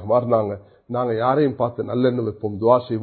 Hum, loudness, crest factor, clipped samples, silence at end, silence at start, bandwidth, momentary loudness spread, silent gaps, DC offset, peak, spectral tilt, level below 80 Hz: none; -21 LUFS; 18 dB; under 0.1%; 0 s; 0 s; 4.5 kHz; 9 LU; none; under 0.1%; -2 dBFS; -12.5 dB/octave; -54 dBFS